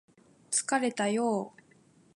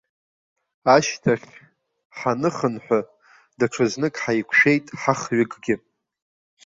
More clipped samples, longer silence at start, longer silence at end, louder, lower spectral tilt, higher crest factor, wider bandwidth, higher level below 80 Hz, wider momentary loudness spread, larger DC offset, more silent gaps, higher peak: neither; second, 0.5 s vs 0.85 s; second, 0.65 s vs 0.9 s; second, -30 LUFS vs -21 LUFS; second, -3 dB/octave vs -5 dB/octave; about the same, 18 dB vs 20 dB; first, 11.5 kHz vs 7.8 kHz; second, -82 dBFS vs -62 dBFS; second, 6 LU vs 10 LU; neither; second, none vs 2.05-2.10 s; second, -14 dBFS vs -2 dBFS